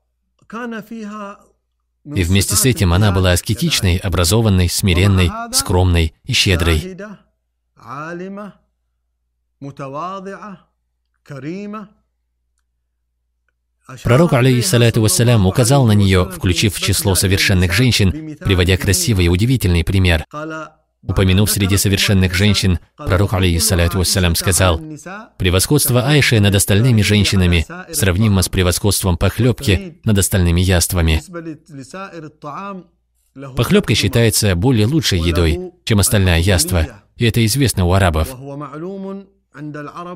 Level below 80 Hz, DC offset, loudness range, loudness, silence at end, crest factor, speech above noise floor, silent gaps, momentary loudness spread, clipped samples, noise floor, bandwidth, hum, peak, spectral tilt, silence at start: -30 dBFS; under 0.1%; 17 LU; -14 LUFS; 0 s; 16 dB; 54 dB; none; 18 LU; under 0.1%; -69 dBFS; 16.5 kHz; none; 0 dBFS; -4.5 dB/octave; 0.5 s